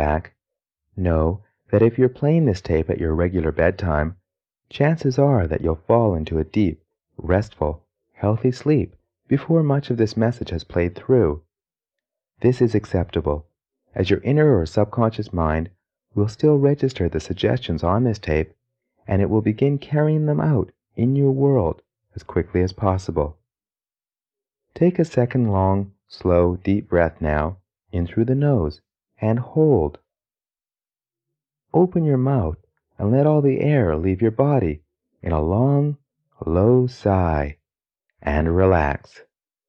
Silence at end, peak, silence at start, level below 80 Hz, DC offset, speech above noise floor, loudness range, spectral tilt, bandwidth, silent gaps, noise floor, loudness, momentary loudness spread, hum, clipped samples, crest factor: 0.7 s; -2 dBFS; 0 s; -36 dBFS; under 0.1%; over 71 dB; 3 LU; -9 dB/octave; 8 kHz; none; under -90 dBFS; -21 LUFS; 10 LU; none; under 0.1%; 18 dB